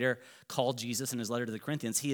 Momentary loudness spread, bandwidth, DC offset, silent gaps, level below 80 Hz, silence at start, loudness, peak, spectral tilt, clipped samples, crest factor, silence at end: 5 LU; over 20 kHz; under 0.1%; none; -88 dBFS; 0 s; -34 LUFS; -14 dBFS; -3.5 dB/octave; under 0.1%; 20 dB; 0 s